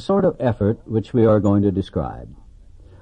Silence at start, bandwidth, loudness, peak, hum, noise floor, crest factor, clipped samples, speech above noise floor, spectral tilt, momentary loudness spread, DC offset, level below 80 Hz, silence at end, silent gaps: 0 s; 8.4 kHz; -19 LUFS; -4 dBFS; none; -44 dBFS; 16 dB; under 0.1%; 25 dB; -9.5 dB/octave; 11 LU; under 0.1%; -42 dBFS; 0.65 s; none